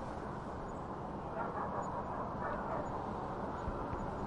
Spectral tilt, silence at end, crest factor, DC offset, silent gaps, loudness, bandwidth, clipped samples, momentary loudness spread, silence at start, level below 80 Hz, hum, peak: -7.5 dB/octave; 0 s; 14 dB; under 0.1%; none; -41 LUFS; 11 kHz; under 0.1%; 4 LU; 0 s; -52 dBFS; none; -26 dBFS